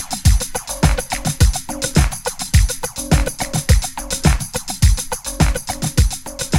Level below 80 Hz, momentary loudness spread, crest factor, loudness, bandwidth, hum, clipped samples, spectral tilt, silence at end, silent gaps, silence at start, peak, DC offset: -20 dBFS; 6 LU; 16 dB; -18 LUFS; 17 kHz; none; under 0.1%; -4 dB/octave; 0 s; none; 0 s; 0 dBFS; under 0.1%